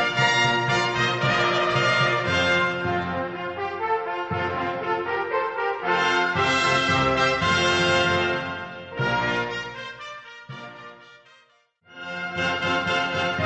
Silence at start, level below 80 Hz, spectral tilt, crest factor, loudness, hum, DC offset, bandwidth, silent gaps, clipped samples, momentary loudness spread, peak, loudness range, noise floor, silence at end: 0 s; -52 dBFS; -4 dB/octave; 18 dB; -22 LUFS; none; under 0.1%; 8.4 kHz; none; under 0.1%; 15 LU; -6 dBFS; 9 LU; -60 dBFS; 0 s